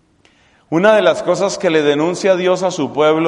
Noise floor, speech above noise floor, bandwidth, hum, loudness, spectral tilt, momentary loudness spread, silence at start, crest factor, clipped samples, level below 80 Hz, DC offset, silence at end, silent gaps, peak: -53 dBFS; 39 dB; 11 kHz; none; -14 LUFS; -5 dB/octave; 6 LU; 0.7 s; 14 dB; under 0.1%; -58 dBFS; under 0.1%; 0 s; none; 0 dBFS